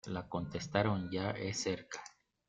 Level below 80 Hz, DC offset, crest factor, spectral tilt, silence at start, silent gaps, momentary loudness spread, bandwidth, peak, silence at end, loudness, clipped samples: -66 dBFS; under 0.1%; 24 dB; -5 dB/octave; 0.05 s; none; 14 LU; 9.2 kHz; -14 dBFS; 0.4 s; -37 LUFS; under 0.1%